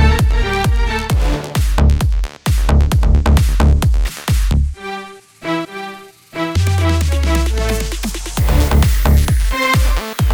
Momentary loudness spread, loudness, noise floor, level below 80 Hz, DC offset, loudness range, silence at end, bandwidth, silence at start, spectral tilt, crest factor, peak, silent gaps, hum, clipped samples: 11 LU; -16 LUFS; -34 dBFS; -16 dBFS; under 0.1%; 4 LU; 0 s; over 20 kHz; 0 s; -5.5 dB/octave; 14 dB; 0 dBFS; none; none; under 0.1%